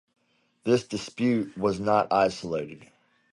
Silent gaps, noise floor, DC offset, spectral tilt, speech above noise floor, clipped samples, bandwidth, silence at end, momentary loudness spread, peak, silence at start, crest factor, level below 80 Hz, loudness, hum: none; -60 dBFS; under 0.1%; -6 dB/octave; 35 dB; under 0.1%; 11.5 kHz; 0.5 s; 11 LU; -8 dBFS; 0.65 s; 20 dB; -60 dBFS; -26 LUFS; none